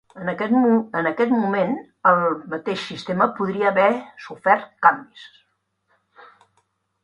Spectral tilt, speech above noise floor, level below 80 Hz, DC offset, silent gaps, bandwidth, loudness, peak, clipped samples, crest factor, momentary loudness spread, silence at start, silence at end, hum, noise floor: -7 dB/octave; 49 dB; -66 dBFS; under 0.1%; none; 10.5 kHz; -20 LUFS; 0 dBFS; under 0.1%; 22 dB; 10 LU; 0.15 s; 1.75 s; none; -70 dBFS